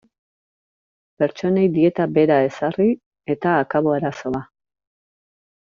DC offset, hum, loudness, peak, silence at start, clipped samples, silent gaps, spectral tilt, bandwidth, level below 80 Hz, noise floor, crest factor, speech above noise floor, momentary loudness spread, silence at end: under 0.1%; none; -20 LUFS; -4 dBFS; 1.2 s; under 0.1%; 3.06-3.11 s; -6.5 dB/octave; 7.2 kHz; -60 dBFS; under -90 dBFS; 18 dB; over 71 dB; 11 LU; 1.15 s